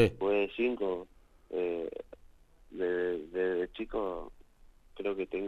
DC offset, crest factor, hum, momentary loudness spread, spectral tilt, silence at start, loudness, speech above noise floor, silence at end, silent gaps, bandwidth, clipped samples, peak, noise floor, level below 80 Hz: under 0.1%; 22 dB; none; 16 LU; -7.5 dB/octave; 0 s; -34 LUFS; 25 dB; 0 s; none; 11 kHz; under 0.1%; -12 dBFS; -58 dBFS; -56 dBFS